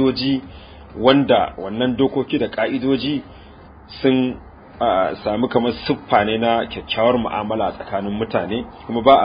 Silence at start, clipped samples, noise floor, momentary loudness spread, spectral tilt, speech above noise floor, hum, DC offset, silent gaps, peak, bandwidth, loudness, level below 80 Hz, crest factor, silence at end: 0 s; under 0.1%; -42 dBFS; 10 LU; -9.5 dB/octave; 23 dB; none; under 0.1%; none; 0 dBFS; 5.2 kHz; -19 LUFS; -44 dBFS; 20 dB; 0 s